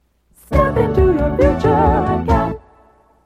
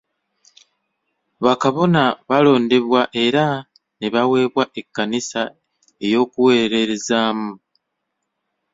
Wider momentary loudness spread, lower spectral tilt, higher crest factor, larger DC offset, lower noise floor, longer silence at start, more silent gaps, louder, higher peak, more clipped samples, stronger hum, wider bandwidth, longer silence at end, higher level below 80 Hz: second, 6 LU vs 11 LU; first, -9 dB/octave vs -5 dB/octave; about the same, 16 dB vs 18 dB; neither; second, -51 dBFS vs -76 dBFS; second, 0.5 s vs 1.4 s; neither; about the same, -16 LUFS vs -18 LUFS; about the same, 0 dBFS vs -2 dBFS; neither; neither; first, 13.5 kHz vs 7.8 kHz; second, 0.65 s vs 1.15 s; first, -24 dBFS vs -62 dBFS